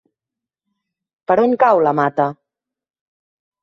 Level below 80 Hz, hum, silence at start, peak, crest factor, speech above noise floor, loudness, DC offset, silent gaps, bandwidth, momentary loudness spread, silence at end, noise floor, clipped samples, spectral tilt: -66 dBFS; none; 1.3 s; -2 dBFS; 18 dB; 72 dB; -16 LUFS; under 0.1%; none; 7.2 kHz; 9 LU; 1.3 s; -87 dBFS; under 0.1%; -8.5 dB/octave